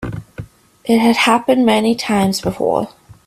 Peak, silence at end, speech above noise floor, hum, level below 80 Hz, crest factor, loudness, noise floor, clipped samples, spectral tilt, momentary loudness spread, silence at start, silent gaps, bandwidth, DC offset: 0 dBFS; 0.4 s; 20 dB; none; -46 dBFS; 16 dB; -15 LUFS; -34 dBFS; under 0.1%; -5 dB/octave; 17 LU; 0 s; none; 14.5 kHz; under 0.1%